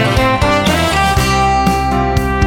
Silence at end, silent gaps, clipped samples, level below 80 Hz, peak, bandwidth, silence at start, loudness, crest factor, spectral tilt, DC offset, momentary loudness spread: 0 s; none; under 0.1%; -22 dBFS; 0 dBFS; 19 kHz; 0 s; -13 LUFS; 12 dB; -5 dB/octave; under 0.1%; 2 LU